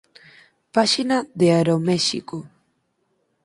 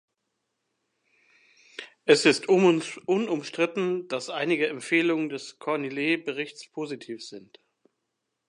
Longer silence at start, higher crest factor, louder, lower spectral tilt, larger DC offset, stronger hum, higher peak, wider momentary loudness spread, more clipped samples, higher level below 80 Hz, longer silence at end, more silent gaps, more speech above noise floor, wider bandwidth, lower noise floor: second, 0.75 s vs 1.8 s; about the same, 20 dB vs 22 dB; first, -20 LUFS vs -26 LUFS; about the same, -5 dB/octave vs -4.5 dB/octave; neither; neither; first, -2 dBFS vs -6 dBFS; second, 13 LU vs 18 LU; neither; first, -64 dBFS vs -82 dBFS; second, 0.95 s vs 1.1 s; neither; second, 50 dB vs 55 dB; about the same, 11.5 kHz vs 11 kHz; second, -69 dBFS vs -81 dBFS